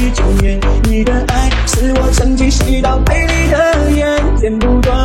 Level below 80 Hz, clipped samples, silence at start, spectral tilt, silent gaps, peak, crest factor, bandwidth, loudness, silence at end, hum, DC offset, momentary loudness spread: -14 dBFS; under 0.1%; 0 s; -5.5 dB/octave; none; 0 dBFS; 10 dB; 15 kHz; -13 LUFS; 0 s; none; under 0.1%; 3 LU